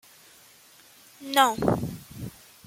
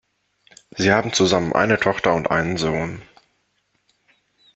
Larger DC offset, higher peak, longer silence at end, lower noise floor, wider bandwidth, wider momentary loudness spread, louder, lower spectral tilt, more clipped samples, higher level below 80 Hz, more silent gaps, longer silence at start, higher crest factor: neither; second, -6 dBFS vs -2 dBFS; second, 0.35 s vs 1.5 s; second, -54 dBFS vs -68 dBFS; first, 16.5 kHz vs 8.4 kHz; first, 20 LU vs 11 LU; second, -24 LUFS vs -19 LUFS; about the same, -4 dB/octave vs -4.5 dB/octave; neither; about the same, -54 dBFS vs -52 dBFS; neither; first, 1.2 s vs 0.75 s; about the same, 24 dB vs 20 dB